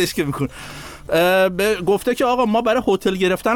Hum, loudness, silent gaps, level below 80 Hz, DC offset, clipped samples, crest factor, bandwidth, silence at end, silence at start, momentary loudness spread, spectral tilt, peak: none; -18 LUFS; none; -44 dBFS; under 0.1%; under 0.1%; 12 dB; 19.5 kHz; 0 s; 0 s; 11 LU; -5 dB/octave; -6 dBFS